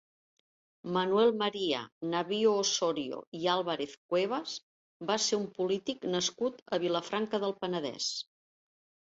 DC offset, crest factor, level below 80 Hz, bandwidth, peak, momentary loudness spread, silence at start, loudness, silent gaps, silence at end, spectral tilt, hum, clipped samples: under 0.1%; 18 dB; -76 dBFS; 8 kHz; -14 dBFS; 10 LU; 0.85 s; -32 LUFS; 1.92-2.01 s, 3.27-3.32 s, 3.97-4.09 s, 4.63-5.00 s, 6.62-6.66 s; 0.95 s; -3.5 dB/octave; none; under 0.1%